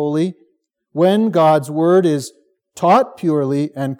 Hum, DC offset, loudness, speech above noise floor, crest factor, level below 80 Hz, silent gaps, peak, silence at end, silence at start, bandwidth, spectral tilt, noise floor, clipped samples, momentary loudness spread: none; under 0.1%; -16 LUFS; 49 dB; 14 dB; -76 dBFS; none; -2 dBFS; 0.05 s; 0 s; 16.5 kHz; -7 dB/octave; -65 dBFS; under 0.1%; 10 LU